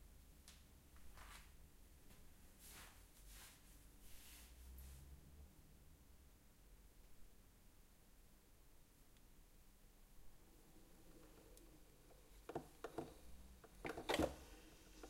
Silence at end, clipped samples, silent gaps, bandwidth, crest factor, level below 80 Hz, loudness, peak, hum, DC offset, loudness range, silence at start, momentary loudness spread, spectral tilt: 0 s; under 0.1%; none; 16 kHz; 32 dB; -66 dBFS; -54 LUFS; -24 dBFS; none; under 0.1%; 18 LU; 0 s; 16 LU; -4 dB/octave